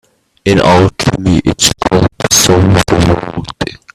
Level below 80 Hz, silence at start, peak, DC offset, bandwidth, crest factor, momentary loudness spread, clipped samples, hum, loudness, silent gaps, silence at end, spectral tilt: -30 dBFS; 0.45 s; 0 dBFS; under 0.1%; 15 kHz; 10 dB; 12 LU; 0.1%; none; -10 LUFS; none; 0.2 s; -4 dB/octave